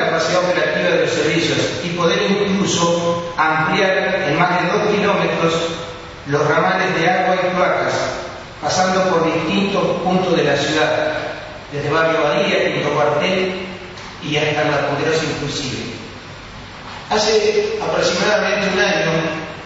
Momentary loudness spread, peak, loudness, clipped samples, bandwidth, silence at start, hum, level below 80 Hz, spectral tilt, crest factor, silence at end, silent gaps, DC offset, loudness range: 12 LU; 0 dBFS; -17 LUFS; under 0.1%; 8 kHz; 0 s; none; -46 dBFS; -4.5 dB/octave; 16 dB; 0 s; none; under 0.1%; 3 LU